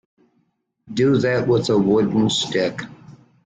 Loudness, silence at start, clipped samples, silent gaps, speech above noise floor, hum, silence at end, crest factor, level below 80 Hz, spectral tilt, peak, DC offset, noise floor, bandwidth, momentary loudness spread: -19 LUFS; 0.9 s; under 0.1%; none; 50 dB; none; 0.5 s; 14 dB; -54 dBFS; -5.5 dB/octave; -6 dBFS; under 0.1%; -68 dBFS; 9.4 kHz; 12 LU